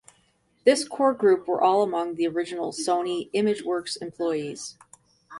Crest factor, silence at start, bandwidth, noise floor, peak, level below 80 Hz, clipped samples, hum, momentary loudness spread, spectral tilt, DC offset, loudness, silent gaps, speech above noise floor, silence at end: 20 dB; 0.65 s; 11.5 kHz; -66 dBFS; -6 dBFS; -70 dBFS; under 0.1%; none; 9 LU; -4 dB/octave; under 0.1%; -25 LUFS; none; 42 dB; 0 s